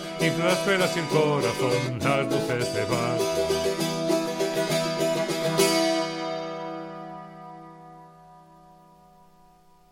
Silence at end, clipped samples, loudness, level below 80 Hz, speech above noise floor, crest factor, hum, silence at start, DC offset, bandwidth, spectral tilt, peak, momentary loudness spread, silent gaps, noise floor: 1.5 s; under 0.1%; -25 LUFS; -58 dBFS; 32 dB; 18 dB; none; 0 s; under 0.1%; 17.5 kHz; -4.5 dB/octave; -8 dBFS; 16 LU; none; -56 dBFS